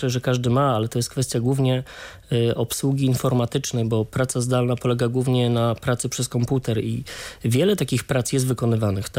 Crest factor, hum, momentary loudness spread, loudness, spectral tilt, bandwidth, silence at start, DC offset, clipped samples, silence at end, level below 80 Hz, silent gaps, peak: 12 dB; none; 5 LU; -22 LUFS; -5.5 dB/octave; 16 kHz; 0 s; under 0.1%; under 0.1%; 0 s; -50 dBFS; none; -8 dBFS